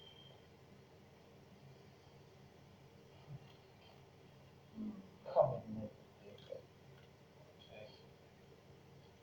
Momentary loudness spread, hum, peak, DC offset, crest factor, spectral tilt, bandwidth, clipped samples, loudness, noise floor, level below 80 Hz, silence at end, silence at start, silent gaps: 21 LU; none; -18 dBFS; under 0.1%; 30 dB; -7.5 dB/octave; over 20 kHz; under 0.1%; -43 LUFS; -63 dBFS; -76 dBFS; 0 s; 0 s; none